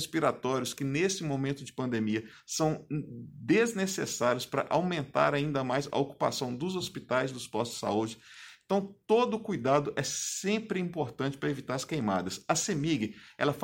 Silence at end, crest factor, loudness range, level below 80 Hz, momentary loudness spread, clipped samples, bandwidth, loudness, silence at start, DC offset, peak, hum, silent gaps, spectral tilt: 0 s; 20 dB; 2 LU; -66 dBFS; 8 LU; under 0.1%; 16.5 kHz; -31 LUFS; 0 s; under 0.1%; -10 dBFS; none; none; -4.5 dB/octave